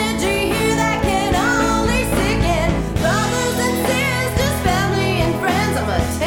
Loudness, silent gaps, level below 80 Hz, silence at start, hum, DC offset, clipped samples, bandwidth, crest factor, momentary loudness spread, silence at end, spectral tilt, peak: -18 LUFS; none; -28 dBFS; 0 s; none; under 0.1%; under 0.1%; 19 kHz; 14 dB; 2 LU; 0 s; -4.5 dB/octave; -2 dBFS